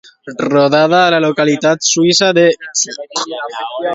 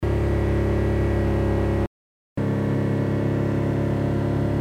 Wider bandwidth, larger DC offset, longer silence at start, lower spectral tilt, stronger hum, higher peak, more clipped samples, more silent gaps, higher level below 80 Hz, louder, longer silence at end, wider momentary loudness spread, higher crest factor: second, 8 kHz vs 10 kHz; neither; first, 0.25 s vs 0 s; second, -3 dB/octave vs -9 dB/octave; neither; first, 0 dBFS vs -12 dBFS; neither; second, none vs 1.87-2.36 s; second, -60 dBFS vs -30 dBFS; first, -12 LUFS vs -23 LUFS; about the same, 0 s vs 0 s; first, 11 LU vs 3 LU; about the same, 14 dB vs 12 dB